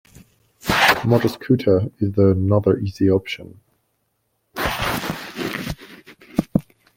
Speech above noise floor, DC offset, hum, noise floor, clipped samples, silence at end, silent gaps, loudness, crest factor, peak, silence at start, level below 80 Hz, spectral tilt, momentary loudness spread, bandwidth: 52 dB; under 0.1%; none; -70 dBFS; under 0.1%; 0.35 s; none; -20 LUFS; 18 dB; -2 dBFS; 0.65 s; -44 dBFS; -6 dB/octave; 14 LU; 16.5 kHz